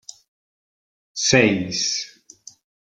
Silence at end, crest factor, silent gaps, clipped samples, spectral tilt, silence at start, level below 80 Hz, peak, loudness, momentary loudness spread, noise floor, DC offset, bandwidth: 0.85 s; 22 dB; none; under 0.1%; -3 dB/octave; 1.15 s; -58 dBFS; -2 dBFS; -19 LUFS; 17 LU; -48 dBFS; under 0.1%; 11 kHz